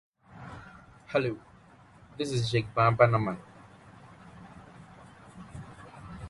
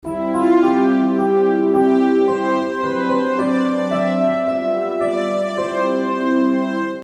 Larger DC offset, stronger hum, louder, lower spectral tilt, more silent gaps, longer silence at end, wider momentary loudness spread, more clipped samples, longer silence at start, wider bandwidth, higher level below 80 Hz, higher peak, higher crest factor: neither; neither; second, -27 LUFS vs -17 LUFS; about the same, -6.5 dB/octave vs -7 dB/octave; neither; about the same, 0 s vs 0 s; first, 27 LU vs 6 LU; neither; first, 0.35 s vs 0.05 s; about the same, 11.5 kHz vs 11 kHz; about the same, -58 dBFS vs -58 dBFS; second, -8 dBFS vs -4 dBFS; first, 26 dB vs 12 dB